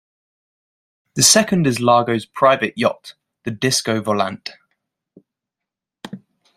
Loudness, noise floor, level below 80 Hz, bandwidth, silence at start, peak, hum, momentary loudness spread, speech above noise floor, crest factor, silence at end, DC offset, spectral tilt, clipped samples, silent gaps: -16 LUFS; -85 dBFS; -60 dBFS; 16 kHz; 1.15 s; 0 dBFS; none; 23 LU; 68 dB; 20 dB; 0.4 s; under 0.1%; -3 dB/octave; under 0.1%; none